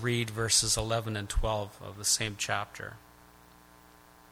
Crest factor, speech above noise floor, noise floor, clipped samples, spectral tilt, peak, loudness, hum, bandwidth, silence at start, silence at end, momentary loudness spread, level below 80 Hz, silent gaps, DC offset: 20 dB; 26 dB; -57 dBFS; under 0.1%; -2.5 dB/octave; -12 dBFS; -29 LUFS; 60 Hz at -60 dBFS; 16.5 kHz; 0 s; 1.35 s; 16 LU; -42 dBFS; none; under 0.1%